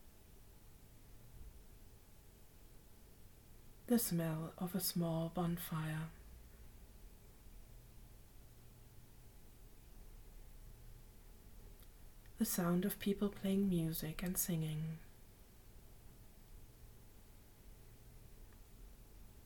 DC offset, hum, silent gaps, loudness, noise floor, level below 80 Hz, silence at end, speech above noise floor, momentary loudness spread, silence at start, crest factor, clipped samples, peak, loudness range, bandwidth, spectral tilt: under 0.1%; none; none; -39 LUFS; -61 dBFS; -60 dBFS; 0 s; 22 dB; 25 LU; 0 s; 22 dB; under 0.1%; -24 dBFS; 23 LU; 19 kHz; -5.5 dB/octave